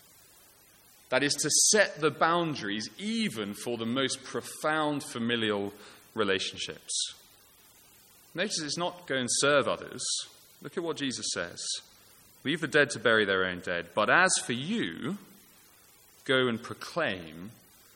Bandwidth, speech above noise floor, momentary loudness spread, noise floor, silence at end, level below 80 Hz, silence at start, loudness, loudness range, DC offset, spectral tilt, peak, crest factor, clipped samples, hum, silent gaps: 17 kHz; 29 dB; 13 LU; -59 dBFS; 0.45 s; -72 dBFS; 1.1 s; -29 LUFS; 6 LU; under 0.1%; -2.5 dB/octave; -8 dBFS; 24 dB; under 0.1%; none; none